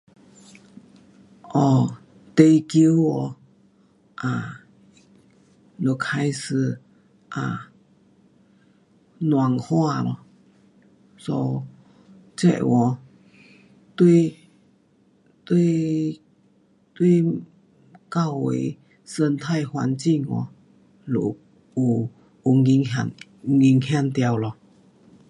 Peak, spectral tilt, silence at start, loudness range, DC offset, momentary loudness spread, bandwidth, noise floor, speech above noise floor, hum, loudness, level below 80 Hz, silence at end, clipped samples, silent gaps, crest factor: -2 dBFS; -7.5 dB/octave; 1.45 s; 7 LU; under 0.1%; 17 LU; 11.5 kHz; -60 dBFS; 40 dB; none; -22 LUFS; -64 dBFS; 0.8 s; under 0.1%; none; 22 dB